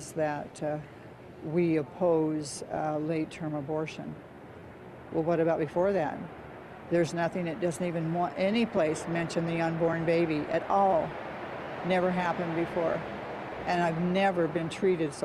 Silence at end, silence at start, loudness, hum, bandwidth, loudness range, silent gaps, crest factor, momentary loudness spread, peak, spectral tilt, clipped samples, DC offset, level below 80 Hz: 0 s; 0 s; -30 LUFS; none; 12.5 kHz; 4 LU; none; 14 dB; 16 LU; -14 dBFS; -6.5 dB/octave; under 0.1%; under 0.1%; -60 dBFS